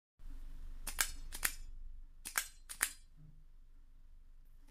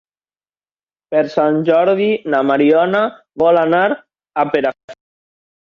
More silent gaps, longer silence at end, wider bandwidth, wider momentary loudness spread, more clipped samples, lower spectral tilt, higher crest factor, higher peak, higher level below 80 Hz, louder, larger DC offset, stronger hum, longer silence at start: second, none vs 4.84-4.88 s; second, 0 s vs 0.85 s; first, 16 kHz vs 7 kHz; first, 20 LU vs 8 LU; neither; second, 0.5 dB/octave vs -7.5 dB/octave; first, 34 dB vs 14 dB; second, -10 dBFS vs -2 dBFS; first, -50 dBFS vs -62 dBFS; second, -40 LUFS vs -15 LUFS; neither; neither; second, 0.2 s vs 1.1 s